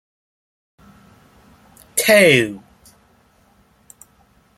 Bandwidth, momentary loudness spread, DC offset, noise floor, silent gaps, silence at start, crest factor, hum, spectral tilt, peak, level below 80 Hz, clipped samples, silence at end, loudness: 16 kHz; 16 LU; under 0.1%; -56 dBFS; none; 1.95 s; 22 dB; none; -3.5 dB/octave; 0 dBFS; -58 dBFS; under 0.1%; 2 s; -14 LUFS